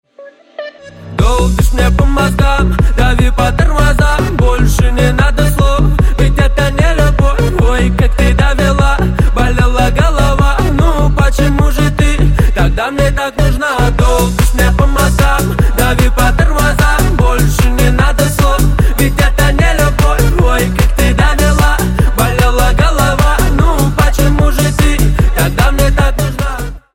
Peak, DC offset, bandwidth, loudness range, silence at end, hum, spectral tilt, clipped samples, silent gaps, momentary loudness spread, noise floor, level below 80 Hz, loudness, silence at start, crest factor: 0 dBFS; under 0.1%; 17 kHz; 1 LU; 0.15 s; none; -5.5 dB/octave; under 0.1%; none; 2 LU; -37 dBFS; -12 dBFS; -11 LUFS; 0.2 s; 10 dB